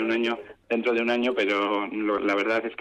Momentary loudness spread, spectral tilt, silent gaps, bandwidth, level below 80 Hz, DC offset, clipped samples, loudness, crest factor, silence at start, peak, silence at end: 4 LU; -5 dB/octave; none; 9.2 kHz; -66 dBFS; under 0.1%; under 0.1%; -25 LUFS; 12 dB; 0 s; -14 dBFS; 0.05 s